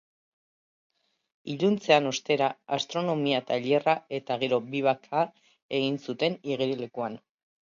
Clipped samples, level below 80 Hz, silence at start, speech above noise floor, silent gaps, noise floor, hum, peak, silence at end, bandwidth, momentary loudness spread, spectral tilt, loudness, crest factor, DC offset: under 0.1%; -76 dBFS; 1.45 s; over 63 dB; 5.62-5.69 s; under -90 dBFS; none; -6 dBFS; 0.5 s; 7.6 kHz; 10 LU; -5 dB/octave; -28 LUFS; 22 dB; under 0.1%